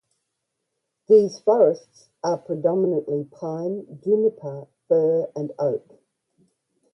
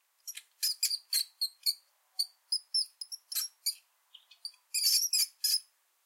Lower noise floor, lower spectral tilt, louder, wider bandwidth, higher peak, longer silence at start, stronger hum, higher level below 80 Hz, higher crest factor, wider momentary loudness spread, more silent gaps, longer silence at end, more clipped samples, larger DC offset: first, -79 dBFS vs -62 dBFS; first, -8 dB/octave vs 11 dB/octave; first, -22 LUFS vs -31 LUFS; second, 6.2 kHz vs 16.5 kHz; first, -6 dBFS vs -14 dBFS; first, 1.1 s vs 0.25 s; neither; first, -72 dBFS vs under -90 dBFS; about the same, 18 dB vs 22 dB; second, 14 LU vs 19 LU; neither; first, 1.15 s vs 0.45 s; neither; neither